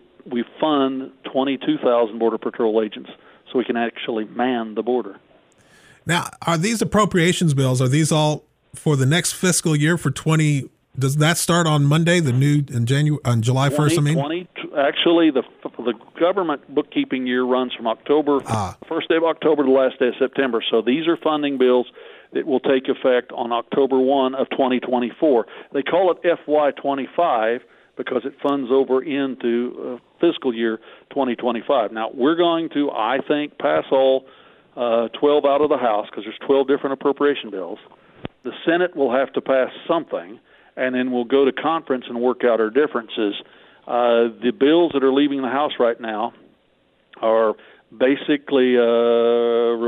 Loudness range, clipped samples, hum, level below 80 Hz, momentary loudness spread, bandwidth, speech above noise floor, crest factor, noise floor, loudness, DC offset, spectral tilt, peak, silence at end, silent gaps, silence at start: 4 LU; under 0.1%; none; -60 dBFS; 10 LU; 15.5 kHz; 42 dB; 16 dB; -61 dBFS; -20 LUFS; under 0.1%; -5.5 dB/octave; -4 dBFS; 0 s; none; 0.25 s